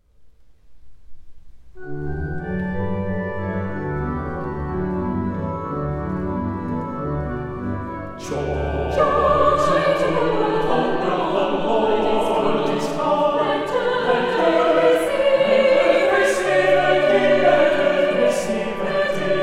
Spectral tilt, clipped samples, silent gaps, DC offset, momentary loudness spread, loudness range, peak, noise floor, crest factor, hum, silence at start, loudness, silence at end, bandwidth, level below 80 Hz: -6 dB/octave; under 0.1%; none; under 0.1%; 11 LU; 10 LU; -2 dBFS; -46 dBFS; 18 dB; none; 0.2 s; -20 LUFS; 0 s; 13.5 kHz; -38 dBFS